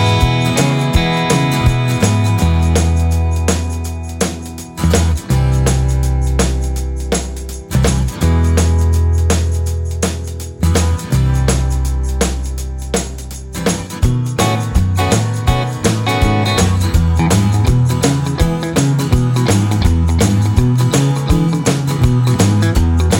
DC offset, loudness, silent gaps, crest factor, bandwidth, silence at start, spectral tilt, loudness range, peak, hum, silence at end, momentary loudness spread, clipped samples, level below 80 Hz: under 0.1%; -15 LUFS; none; 14 dB; 17 kHz; 0 s; -5.5 dB/octave; 4 LU; 0 dBFS; none; 0 s; 7 LU; under 0.1%; -20 dBFS